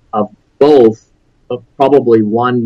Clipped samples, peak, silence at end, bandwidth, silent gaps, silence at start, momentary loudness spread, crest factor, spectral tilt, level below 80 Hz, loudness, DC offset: 0.6%; 0 dBFS; 0 s; 6.8 kHz; none; 0.15 s; 18 LU; 12 dB; -8 dB/octave; -52 dBFS; -10 LUFS; under 0.1%